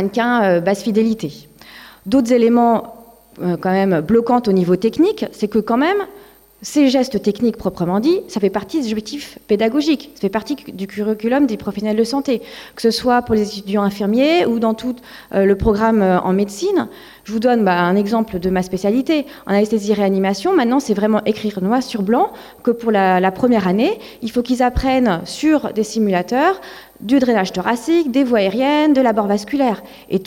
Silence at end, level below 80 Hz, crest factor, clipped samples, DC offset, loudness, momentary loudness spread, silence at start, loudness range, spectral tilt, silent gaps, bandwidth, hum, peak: 0 s; -42 dBFS; 12 dB; under 0.1%; under 0.1%; -17 LUFS; 8 LU; 0 s; 3 LU; -6 dB/octave; none; 16.5 kHz; none; -4 dBFS